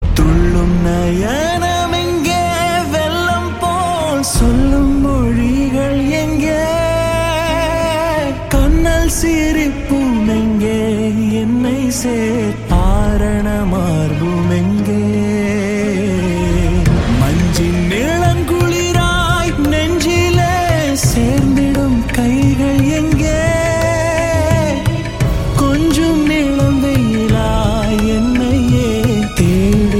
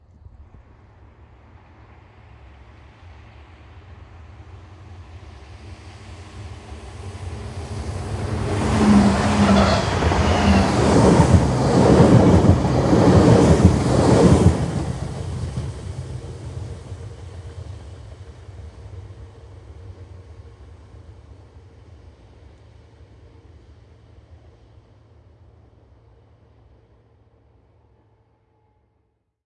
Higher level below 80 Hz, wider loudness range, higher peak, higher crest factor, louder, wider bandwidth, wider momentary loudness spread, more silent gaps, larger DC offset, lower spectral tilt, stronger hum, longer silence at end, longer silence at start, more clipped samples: first, -20 dBFS vs -34 dBFS; second, 2 LU vs 25 LU; about the same, 0 dBFS vs 0 dBFS; second, 12 dB vs 20 dB; first, -14 LUFS vs -17 LUFS; first, 17 kHz vs 11.5 kHz; second, 3 LU vs 27 LU; neither; neither; about the same, -6 dB/octave vs -7 dB/octave; neither; second, 0 s vs 8.5 s; second, 0 s vs 0.4 s; neither